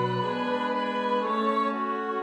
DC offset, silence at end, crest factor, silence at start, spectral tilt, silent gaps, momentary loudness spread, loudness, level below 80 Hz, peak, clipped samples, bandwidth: under 0.1%; 0 s; 12 dB; 0 s; -6.5 dB/octave; none; 3 LU; -27 LUFS; -74 dBFS; -14 dBFS; under 0.1%; 10.5 kHz